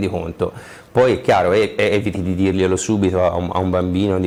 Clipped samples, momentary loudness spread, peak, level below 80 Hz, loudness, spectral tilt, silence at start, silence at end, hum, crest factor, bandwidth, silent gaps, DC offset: under 0.1%; 9 LU; -4 dBFS; -42 dBFS; -18 LUFS; -6 dB/octave; 0 s; 0 s; none; 14 dB; 16 kHz; none; under 0.1%